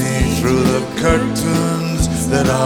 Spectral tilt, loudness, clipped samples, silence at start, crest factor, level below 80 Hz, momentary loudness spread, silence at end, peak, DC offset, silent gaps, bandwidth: -5.5 dB/octave; -16 LUFS; under 0.1%; 0 s; 16 dB; -28 dBFS; 3 LU; 0 s; 0 dBFS; 0.3%; none; 19.5 kHz